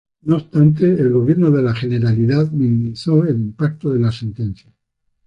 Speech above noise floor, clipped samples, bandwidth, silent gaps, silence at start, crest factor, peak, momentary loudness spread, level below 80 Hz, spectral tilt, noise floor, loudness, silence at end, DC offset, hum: 53 dB; under 0.1%; 7.8 kHz; none; 0.25 s; 14 dB; -2 dBFS; 9 LU; -48 dBFS; -9.5 dB/octave; -69 dBFS; -17 LUFS; 0.75 s; under 0.1%; none